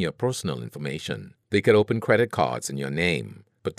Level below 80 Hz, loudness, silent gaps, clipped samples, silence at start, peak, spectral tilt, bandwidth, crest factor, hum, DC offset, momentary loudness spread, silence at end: -58 dBFS; -25 LUFS; none; under 0.1%; 0 s; -4 dBFS; -5.5 dB/octave; 15 kHz; 20 dB; none; under 0.1%; 13 LU; 0.05 s